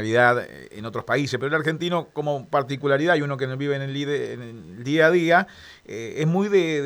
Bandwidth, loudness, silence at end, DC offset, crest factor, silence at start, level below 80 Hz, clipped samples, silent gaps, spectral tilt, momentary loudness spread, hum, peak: 19.5 kHz; -22 LUFS; 0 s; under 0.1%; 18 dB; 0 s; -64 dBFS; under 0.1%; none; -6 dB/octave; 16 LU; none; -4 dBFS